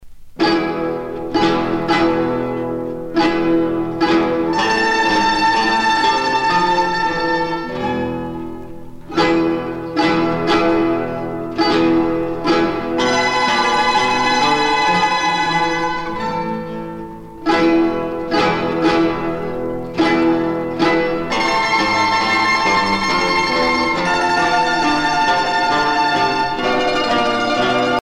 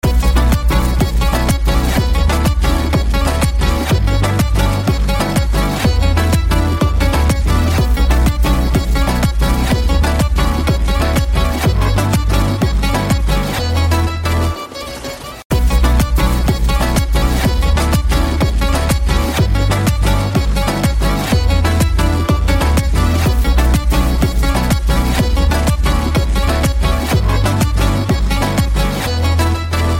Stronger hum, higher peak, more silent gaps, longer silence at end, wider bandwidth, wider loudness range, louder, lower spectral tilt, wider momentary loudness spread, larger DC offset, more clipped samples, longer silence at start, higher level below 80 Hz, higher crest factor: neither; about the same, -4 dBFS vs -2 dBFS; second, none vs 15.45-15.50 s; about the same, 0 s vs 0 s; second, 11.5 kHz vs 16.5 kHz; about the same, 4 LU vs 2 LU; about the same, -16 LUFS vs -15 LUFS; about the same, -4.5 dB/octave vs -5.5 dB/octave; first, 8 LU vs 2 LU; neither; neither; about the same, 0 s vs 0.05 s; second, -42 dBFS vs -16 dBFS; about the same, 14 dB vs 12 dB